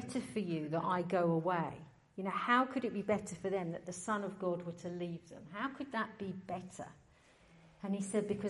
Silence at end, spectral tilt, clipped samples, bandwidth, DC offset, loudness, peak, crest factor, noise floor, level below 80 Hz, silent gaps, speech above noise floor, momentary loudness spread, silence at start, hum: 0 s; -6 dB/octave; under 0.1%; 11.5 kHz; under 0.1%; -38 LUFS; -18 dBFS; 20 dB; -65 dBFS; -74 dBFS; none; 28 dB; 14 LU; 0 s; none